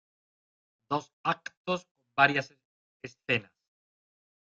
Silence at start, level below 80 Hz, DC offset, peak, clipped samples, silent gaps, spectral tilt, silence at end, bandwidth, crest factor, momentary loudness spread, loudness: 0.9 s; -74 dBFS; under 0.1%; -8 dBFS; under 0.1%; 1.13-1.24 s, 1.57-1.65 s, 1.91-1.95 s, 2.65-3.00 s; -5 dB/octave; 1.05 s; 7.8 kHz; 26 dB; 20 LU; -30 LUFS